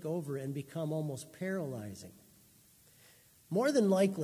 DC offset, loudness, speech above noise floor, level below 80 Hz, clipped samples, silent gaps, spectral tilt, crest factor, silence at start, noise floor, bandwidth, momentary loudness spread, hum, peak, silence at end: under 0.1%; -34 LUFS; 30 dB; -74 dBFS; under 0.1%; none; -6.5 dB/octave; 18 dB; 0 s; -63 dBFS; 16 kHz; 16 LU; none; -18 dBFS; 0 s